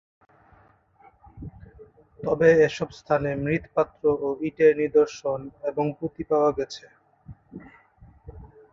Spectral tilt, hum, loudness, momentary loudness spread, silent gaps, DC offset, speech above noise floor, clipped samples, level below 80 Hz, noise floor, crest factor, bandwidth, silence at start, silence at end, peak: -6.5 dB/octave; none; -24 LUFS; 24 LU; none; under 0.1%; 35 dB; under 0.1%; -54 dBFS; -58 dBFS; 20 dB; 7.4 kHz; 1.35 s; 0.25 s; -6 dBFS